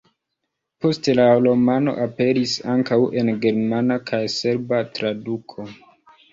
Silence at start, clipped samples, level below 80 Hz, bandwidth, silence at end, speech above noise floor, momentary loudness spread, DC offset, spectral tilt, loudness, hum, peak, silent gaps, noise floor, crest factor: 0.8 s; under 0.1%; -60 dBFS; 7.6 kHz; 0.6 s; 59 dB; 12 LU; under 0.1%; -6 dB/octave; -20 LUFS; none; -4 dBFS; none; -78 dBFS; 16 dB